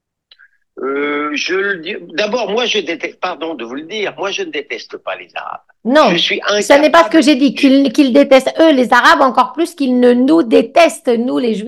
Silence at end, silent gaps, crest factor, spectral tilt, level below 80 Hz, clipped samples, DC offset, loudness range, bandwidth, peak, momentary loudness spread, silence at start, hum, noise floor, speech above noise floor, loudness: 0 s; none; 12 dB; -4 dB/octave; -58 dBFS; 0.3%; 0.1%; 9 LU; 12.5 kHz; 0 dBFS; 15 LU; 0.75 s; none; -49 dBFS; 36 dB; -12 LUFS